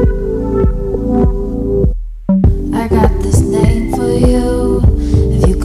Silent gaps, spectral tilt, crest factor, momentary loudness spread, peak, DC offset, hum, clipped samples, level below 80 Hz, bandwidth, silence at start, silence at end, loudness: none; -8 dB/octave; 10 dB; 5 LU; -2 dBFS; under 0.1%; none; under 0.1%; -16 dBFS; 13 kHz; 0 s; 0 s; -13 LUFS